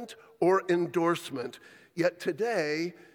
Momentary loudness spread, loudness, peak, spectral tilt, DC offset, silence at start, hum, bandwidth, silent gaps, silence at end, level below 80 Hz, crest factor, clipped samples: 13 LU; -29 LUFS; -12 dBFS; -5.5 dB/octave; under 0.1%; 0 s; none; 18.5 kHz; none; 0.25 s; -80 dBFS; 16 dB; under 0.1%